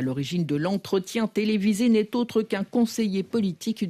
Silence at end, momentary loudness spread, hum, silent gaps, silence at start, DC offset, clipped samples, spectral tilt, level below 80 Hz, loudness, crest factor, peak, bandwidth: 0 s; 5 LU; none; none; 0 s; under 0.1%; under 0.1%; -6 dB/octave; -64 dBFS; -25 LUFS; 12 dB; -12 dBFS; 15 kHz